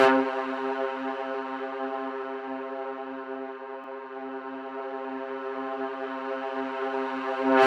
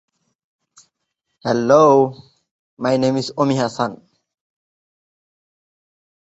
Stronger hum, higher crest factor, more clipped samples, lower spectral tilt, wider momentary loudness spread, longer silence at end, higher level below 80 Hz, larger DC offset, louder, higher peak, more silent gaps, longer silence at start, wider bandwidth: neither; about the same, 22 dB vs 20 dB; neither; second, -4.5 dB/octave vs -6 dB/octave; second, 8 LU vs 13 LU; second, 0 s vs 2.45 s; second, -86 dBFS vs -62 dBFS; neither; second, -32 LUFS vs -17 LUFS; second, -8 dBFS vs -2 dBFS; second, none vs 2.51-2.77 s; second, 0 s vs 1.45 s; first, 9.4 kHz vs 8.2 kHz